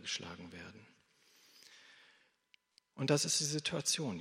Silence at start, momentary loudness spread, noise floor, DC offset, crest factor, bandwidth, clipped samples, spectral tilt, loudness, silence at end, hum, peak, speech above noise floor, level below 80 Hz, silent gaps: 0 s; 26 LU; -73 dBFS; under 0.1%; 24 dB; 16 kHz; under 0.1%; -3 dB/octave; -34 LUFS; 0 s; none; -16 dBFS; 36 dB; -80 dBFS; none